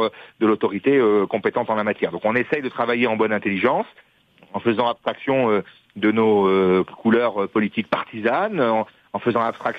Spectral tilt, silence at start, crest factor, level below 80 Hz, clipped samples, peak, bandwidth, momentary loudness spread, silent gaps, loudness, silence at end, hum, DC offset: -8 dB/octave; 0 s; 20 dB; -64 dBFS; under 0.1%; -2 dBFS; 5.4 kHz; 8 LU; none; -21 LUFS; 0 s; none; under 0.1%